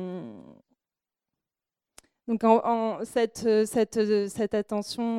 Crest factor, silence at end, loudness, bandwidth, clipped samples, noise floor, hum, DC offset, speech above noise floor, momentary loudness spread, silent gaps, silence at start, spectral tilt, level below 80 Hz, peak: 20 dB; 0 s; -26 LUFS; 14 kHz; under 0.1%; under -90 dBFS; none; under 0.1%; over 65 dB; 14 LU; none; 0 s; -5.5 dB/octave; -66 dBFS; -6 dBFS